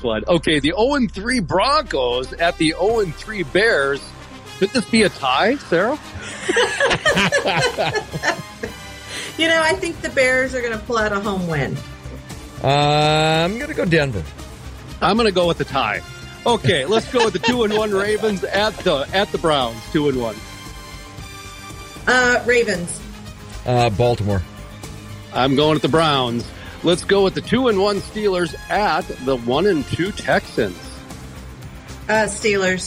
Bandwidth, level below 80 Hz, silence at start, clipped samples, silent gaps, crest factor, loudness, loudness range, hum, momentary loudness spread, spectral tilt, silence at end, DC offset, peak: 16 kHz; -40 dBFS; 0 s; under 0.1%; none; 16 dB; -18 LUFS; 3 LU; none; 19 LU; -4.5 dB/octave; 0 s; under 0.1%; -4 dBFS